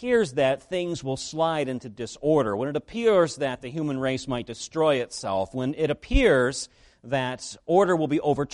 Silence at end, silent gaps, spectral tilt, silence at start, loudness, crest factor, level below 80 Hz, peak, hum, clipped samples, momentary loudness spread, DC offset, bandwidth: 0.05 s; none; -5 dB/octave; 0 s; -25 LUFS; 18 dB; -40 dBFS; -6 dBFS; none; under 0.1%; 10 LU; under 0.1%; 11.5 kHz